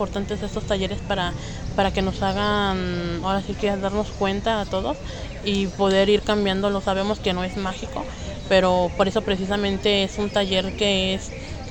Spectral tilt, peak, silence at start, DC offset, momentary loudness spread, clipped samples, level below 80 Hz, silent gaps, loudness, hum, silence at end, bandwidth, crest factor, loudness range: -5 dB/octave; -4 dBFS; 0 s; under 0.1%; 9 LU; under 0.1%; -36 dBFS; none; -23 LUFS; none; 0 s; 16.5 kHz; 18 dB; 3 LU